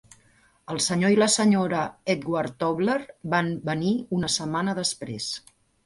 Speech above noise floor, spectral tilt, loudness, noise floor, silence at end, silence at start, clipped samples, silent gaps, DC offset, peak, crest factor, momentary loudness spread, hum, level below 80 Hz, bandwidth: 36 dB; -4 dB/octave; -25 LUFS; -60 dBFS; 0.45 s; 0.7 s; under 0.1%; none; under 0.1%; -8 dBFS; 18 dB; 11 LU; none; -60 dBFS; 11.5 kHz